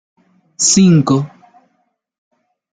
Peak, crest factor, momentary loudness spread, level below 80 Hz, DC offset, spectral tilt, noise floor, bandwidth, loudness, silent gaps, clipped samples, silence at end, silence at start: -2 dBFS; 16 dB; 10 LU; -52 dBFS; under 0.1%; -4.5 dB/octave; -65 dBFS; 9.6 kHz; -12 LUFS; none; under 0.1%; 1.45 s; 0.6 s